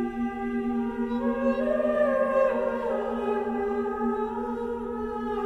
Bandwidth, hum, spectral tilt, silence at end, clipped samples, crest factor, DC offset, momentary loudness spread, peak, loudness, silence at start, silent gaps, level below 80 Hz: 8 kHz; none; -7.5 dB/octave; 0 s; under 0.1%; 14 dB; under 0.1%; 7 LU; -12 dBFS; -27 LUFS; 0 s; none; -50 dBFS